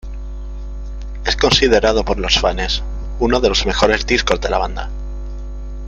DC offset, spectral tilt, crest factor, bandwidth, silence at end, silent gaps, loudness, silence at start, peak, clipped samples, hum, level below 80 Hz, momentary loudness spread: under 0.1%; -4 dB/octave; 18 dB; 8 kHz; 0 s; none; -16 LUFS; 0.05 s; 0 dBFS; under 0.1%; none; -24 dBFS; 18 LU